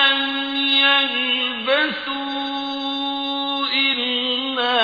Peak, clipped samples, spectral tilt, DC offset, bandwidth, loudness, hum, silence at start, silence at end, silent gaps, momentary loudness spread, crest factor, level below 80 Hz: -4 dBFS; under 0.1%; -3 dB/octave; under 0.1%; 5 kHz; -19 LUFS; none; 0 s; 0 s; none; 10 LU; 16 dB; -62 dBFS